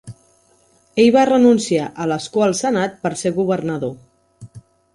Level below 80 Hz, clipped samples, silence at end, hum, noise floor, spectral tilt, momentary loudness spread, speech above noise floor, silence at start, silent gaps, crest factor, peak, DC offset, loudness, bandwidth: -56 dBFS; under 0.1%; 0.35 s; none; -56 dBFS; -5 dB/octave; 11 LU; 40 dB; 0.05 s; none; 16 dB; -2 dBFS; under 0.1%; -17 LUFS; 11.5 kHz